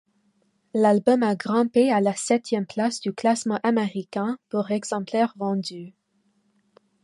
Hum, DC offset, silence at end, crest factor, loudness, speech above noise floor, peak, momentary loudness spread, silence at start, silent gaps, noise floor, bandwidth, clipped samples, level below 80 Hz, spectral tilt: none; under 0.1%; 1.15 s; 18 dB; -23 LUFS; 45 dB; -6 dBFS; 9 LU; 0.75 s; none; -68 dBFS; 11.5 kHz; under 0.1%; -72 dBFS; -5.5 dB/octave